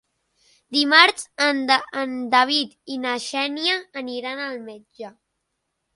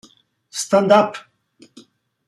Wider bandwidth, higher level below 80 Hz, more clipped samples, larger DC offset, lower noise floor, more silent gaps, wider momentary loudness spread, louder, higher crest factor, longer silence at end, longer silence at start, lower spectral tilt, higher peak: second, 11.5 kHz vs 13 kHz; about the same, -74 dBFS vs -72 dBFS; neither; neither; first, -77 dBFS vs -53 dBFS; neither; first, 22 LU vs 18 LU; second, -20 LUFS vs -17 LUFS; about the same, 24 dB vs 20 dB; second, 0.85 s vs 1.1 s; first, 0.7 s vs 0.55 s; second, -1 dB/octave vs -4.5 dB/octave; about the same, 0 dBFS vs -2 dBFS